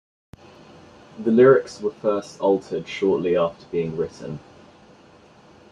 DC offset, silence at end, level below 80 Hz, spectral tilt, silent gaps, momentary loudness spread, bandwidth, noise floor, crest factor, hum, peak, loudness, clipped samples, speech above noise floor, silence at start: under 0.1%; 1.35 s; -60 dBFS; -7 dB/octave; none; 15 LU; 9.6 kHz; -51 dBFS; 20 dB; none; -4 dBFS; -21 LUFS; under 0.1%; 30 dB; 1.15 s